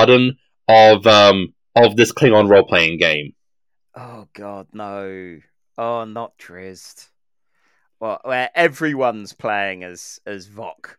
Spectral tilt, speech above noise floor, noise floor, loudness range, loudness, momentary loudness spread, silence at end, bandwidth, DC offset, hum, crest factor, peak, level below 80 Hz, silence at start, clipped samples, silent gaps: -4.5 dB/octave; 70 dB; -86 dBFS; 18 LU; -14 LUFS; 24 LU; 0.25 s; 18 kHz; under 0.1%; none; 16 dB; 0 dBFS; -58 dBFS; 0 s; under 0.1%; none